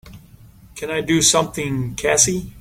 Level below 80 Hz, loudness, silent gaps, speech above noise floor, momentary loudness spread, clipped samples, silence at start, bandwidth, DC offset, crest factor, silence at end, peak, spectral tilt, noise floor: -44 dBFS; -17 LUFS; none; 26 dB; 11 LU; under 0.1%; 0.05 s; 17 kHz; under 0.1%; 20 dB; 0 s; 0 dBFS; -3 dB/octave; -45 dBFS